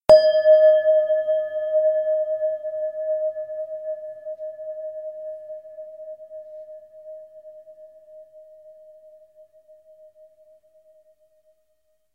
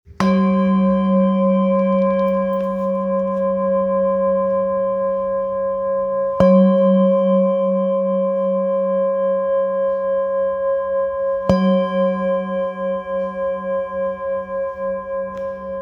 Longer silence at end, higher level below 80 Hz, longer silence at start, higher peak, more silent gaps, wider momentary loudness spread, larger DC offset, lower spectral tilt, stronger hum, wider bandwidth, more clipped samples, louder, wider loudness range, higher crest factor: first, 3.45 s vs 0 s; second, -60 dBFS vs -48 dBFS; about the same, 0.1 s vs 0.1 s; about the same, 0 dBFS vs 0 dBFS; neither; first, 27 LU vs 8 LU; neither; second, -4.5 dB/octave vs -9.5 dB/octave; neither; first, 8.2 kHz vs 6.2 kHz; neither; second, -21 LUFS vs -18 LUFS; first, 25 LU vs 4 LU; about the same, 22 dB vs 18 dB